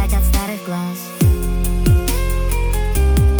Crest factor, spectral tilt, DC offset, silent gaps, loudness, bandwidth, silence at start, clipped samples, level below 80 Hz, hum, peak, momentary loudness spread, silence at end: 10 dB; -6 dB/octave; under 0.1%; none; -18 LUFS; over 20 kHz; 0 s; under 0.1%; -18 dBFS; none; -4 dBFS; 8 LU; 0 s